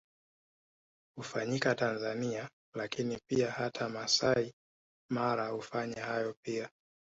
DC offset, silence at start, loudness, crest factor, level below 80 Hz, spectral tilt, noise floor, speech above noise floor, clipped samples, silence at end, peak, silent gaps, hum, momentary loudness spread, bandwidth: under 0.1%; 1.15 s; -34 LUFS; 20 dB; -70 dBFS; -3.5 dB/octave; under -90 dBFS; over 56 dB; under 0.1%; 0.45 s; -16 dBFS; 2.53-2.72 s, 4.53-5.09 s, 6.37-6.43 s; none; 12 LU; 8 kHz